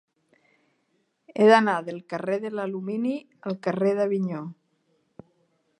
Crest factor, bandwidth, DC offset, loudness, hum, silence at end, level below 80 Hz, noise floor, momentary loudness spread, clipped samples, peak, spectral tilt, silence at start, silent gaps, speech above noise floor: 24 dB; 9.8 kHz; under 0.1%; -25 LUFS; none; 1.25 s; -80 dBFS; -72 dBFS; 16 LU; under 0.1%; -4 dBFS; -6.5 dB/octave; 1.35 s; none; 48 dB